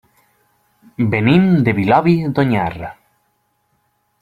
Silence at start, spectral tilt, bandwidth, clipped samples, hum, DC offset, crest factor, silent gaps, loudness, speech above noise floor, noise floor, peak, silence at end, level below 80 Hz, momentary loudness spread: 1 s; -9 dB/octave; 4.9 kHz; under 0.1%; none; under 0.1%; 16 dB; none; -15 LUFS; 51 dB; -65 dBFS; -2 dBFS; 1.3 s; -48 dBFS; 17 LU